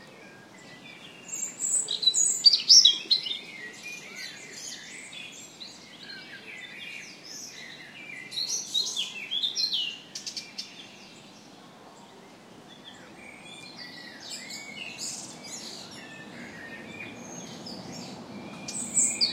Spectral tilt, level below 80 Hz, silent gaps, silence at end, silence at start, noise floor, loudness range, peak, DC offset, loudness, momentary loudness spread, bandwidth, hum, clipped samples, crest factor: 1 dB/octave; -76 dBFS; none; 0 s; 0 s; -50 dBFS; 21 LU; -4 dBFS; under 0.1%; -23 LUFS; 23 LU; 16 kHz; none; under 0.1%; 26 dB